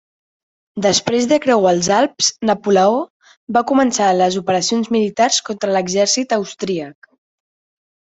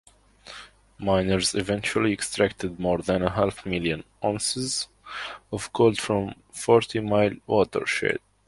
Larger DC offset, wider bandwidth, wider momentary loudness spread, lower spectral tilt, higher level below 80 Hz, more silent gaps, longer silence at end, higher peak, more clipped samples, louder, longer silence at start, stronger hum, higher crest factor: neither; second, 8.4 kHz vs 11.5 kHz; second, 8 LU vs 13 LU; about the same, -3.5 dB/octave vs -4.5 dB/octave; second, -58 dBFS vs -50 dBFS; first, 3.10-3.20 s, 3.37-3.47 s vs none; first, 1.25 s vs 0.3 s; about the same, -2 dBFS vs -4 dBFS; neither; first, -16 LUFS vs -25 LUFS; first, 0.75 s vs 0.45 s; neither; second, 16 dB vs 22 dB